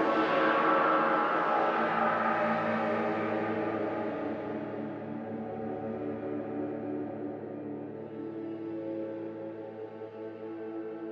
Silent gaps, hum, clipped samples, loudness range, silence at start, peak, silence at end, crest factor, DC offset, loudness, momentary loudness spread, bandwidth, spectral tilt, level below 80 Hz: none; none; under 0.1%; 12 LU; 0 s; -14 dBFS; 0 s; 18 dB; under 0.1%; -32 LUFS; 15 LU; 7.2 kHz; -7.5 dB/octave; -76 dBFS